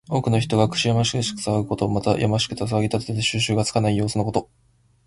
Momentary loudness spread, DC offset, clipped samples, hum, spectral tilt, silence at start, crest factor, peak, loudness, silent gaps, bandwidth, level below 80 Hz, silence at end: 4 LU; under 0.1%; under 0.1%; none; -5 dB/octave; 0.1 s; 18 dB; -4 dBFS; -22 LUFS; none; 11.5 kHz; -46 dBFS; 0.65 s